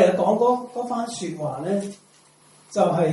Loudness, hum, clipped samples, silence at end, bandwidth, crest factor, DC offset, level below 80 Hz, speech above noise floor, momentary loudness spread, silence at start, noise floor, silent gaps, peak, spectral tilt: -24 LUFS; none; under 0.1%; 0 s; 11.5 kHz; 20 dB; under 0.1%; -68 dBFS; 32 dB; 10 LU; 0 s; -54 dBFS; none; -2 dBFS; -6 dB/octave